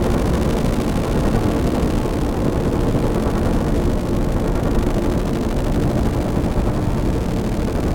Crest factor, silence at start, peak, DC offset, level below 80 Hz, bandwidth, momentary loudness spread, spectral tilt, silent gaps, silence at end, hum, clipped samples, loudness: 14 dB; 0 s; -4 dBFS; under 0.1%; -22 dBFS; 17 kHz; 2 LU; -7 dB/octave; none; 0 s; none; under 0.1%; -20 LUFS